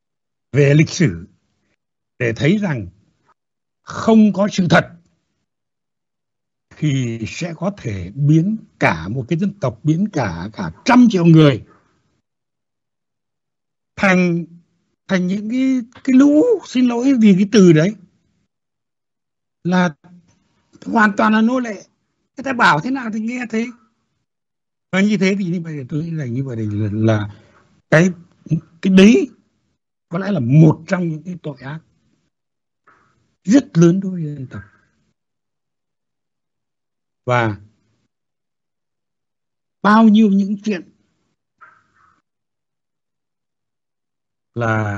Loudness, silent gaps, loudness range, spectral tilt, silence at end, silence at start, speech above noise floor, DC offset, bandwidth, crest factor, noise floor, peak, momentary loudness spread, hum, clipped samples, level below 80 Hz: -16 LUFS; none; 11 LU; -7 dB/octave; 0 s; 0.55 s; 72 dB; under 0.1%; 8 kHz; 18 dB; -87 dBFS; 0 dBFS; 17 LU; none; under 0.1%; -54 dBFS